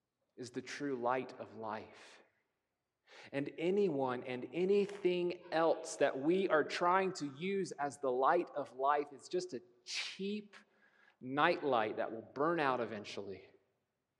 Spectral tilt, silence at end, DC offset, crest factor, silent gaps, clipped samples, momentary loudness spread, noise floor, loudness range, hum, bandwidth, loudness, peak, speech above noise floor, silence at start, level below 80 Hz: -5 dB/octave; 0.75 s; under 0.1%; 22 dB; none; under 0.1%; 14 LU; -88 dBFS; 6 LU; none; 11 kHz; -36 LUFS; -14 dBFS; 52 dB; 0.4 s; under -90 dBFS